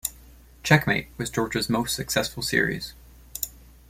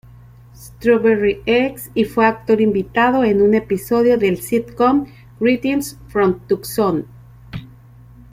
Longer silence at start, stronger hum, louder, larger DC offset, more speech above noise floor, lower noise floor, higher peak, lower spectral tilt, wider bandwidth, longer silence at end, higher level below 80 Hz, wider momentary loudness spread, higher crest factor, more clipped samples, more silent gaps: second, 0.05 s vs 0.6 s; neither; second, -25 LUFS vs -17 LUFS; neither; about the same, 25 dB vs 26 dB; first, -50 dBFS vs -43 dBFS; about the same, -4 dBFS vs -2 dBFS; second, -4 dB/octave vs -6 dB/octave; about the same, 16.5 kHz vs 16 kHz; second, 0.3 s vs 0.65 s; about the same, -48 dBFS vs -46 dBFS; first, 14 LU vs 9 LU; first, 22 dB vs 16 dB; neither; neither